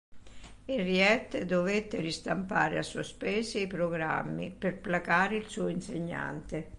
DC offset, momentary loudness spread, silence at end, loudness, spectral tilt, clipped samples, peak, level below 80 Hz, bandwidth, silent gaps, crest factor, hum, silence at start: under 0.1%; 11 LU; 0 s; -31 LUFS; -5 dB/octave; under 0.1%; -12 dBFS; -56 dBFS; 11.5 kHz; none; 20 dB; none; 0.1 s